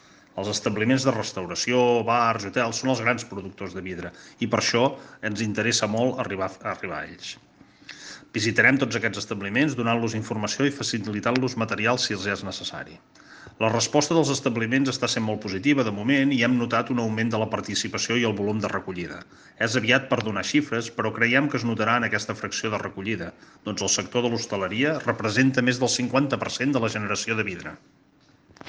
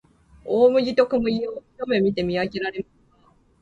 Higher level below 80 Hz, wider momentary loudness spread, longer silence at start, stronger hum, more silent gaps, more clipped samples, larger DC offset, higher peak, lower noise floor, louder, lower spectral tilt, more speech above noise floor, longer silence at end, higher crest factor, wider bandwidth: second, -62 dBFS vs -54 dBFS; second, 13 LU vs 16 LU; about the same, 0.35 s vs 0.45 s; neither; neither; neither; neither; about the same, -4 dBFS vs -6 dBFS; about the same, -58 dBFS vs -58 dBFS; about the same, -24 LUFS vs -22 LUFS; second, -4 dB/octave vs -7 dB/octave; second, 33 dB vs 37 dB; second, 0 s vs 0.8 s; about the same, 22 dB vs 18 dB; first, 10 kHz vs 7.4 kHz